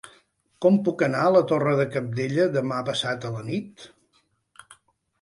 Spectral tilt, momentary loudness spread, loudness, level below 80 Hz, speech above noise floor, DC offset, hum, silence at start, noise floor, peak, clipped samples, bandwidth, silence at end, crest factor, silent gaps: -6.5 dB/octave; 11 LU; -23 LUFS; -66 dBFS; 45 dB; under 0.1%; none; 0.05 s; -68 dBFS; -6 dBFS; under 0.1%; 11.5 kHz; 0.5 s; 18 dB; none